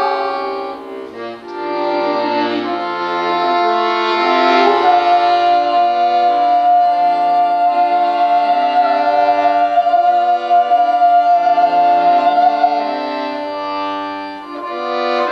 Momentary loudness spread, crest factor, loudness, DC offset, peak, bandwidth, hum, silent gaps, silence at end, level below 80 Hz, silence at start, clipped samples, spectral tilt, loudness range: 11 LU; 14 dB; -14 LUFS; under 0.1%; 0 dBFS; 6.6 kHz; none; none; 0 s; -64 dBFS; 0 s; under 0.1%; -4.5 dB/octave; 5 LU